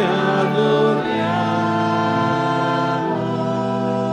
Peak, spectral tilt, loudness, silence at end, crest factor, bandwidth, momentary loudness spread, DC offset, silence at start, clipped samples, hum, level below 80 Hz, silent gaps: -4 dBFS; -7 dB/octave; -19 LUFS; 0 s; 14 dB; 11 kHz; 4 LU; under 0.1%; 0 s; under 0.1%; none; -58 dBFS; none